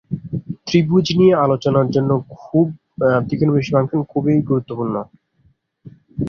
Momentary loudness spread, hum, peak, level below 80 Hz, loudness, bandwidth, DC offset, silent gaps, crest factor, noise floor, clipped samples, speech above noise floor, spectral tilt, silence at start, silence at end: 13 LU; none; -2 dBFS; -50 dBFS; -18 LUFS; 7 kHz; under 0.1%; none; 16 dB; -59 dBFS; under 0.1%; 43 dB; -8 dB/octave; 0.1 s; 0 s